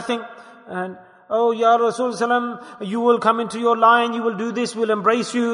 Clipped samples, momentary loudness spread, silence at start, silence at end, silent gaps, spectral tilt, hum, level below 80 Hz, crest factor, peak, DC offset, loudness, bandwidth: under 0.1%; 14 LU; 0 s; 0 s; none; -4.5 dB/octave; none; -74 dBFS; 16 dB; -2 dBFS; under 0.1%; -19 LUFS; 11 kHz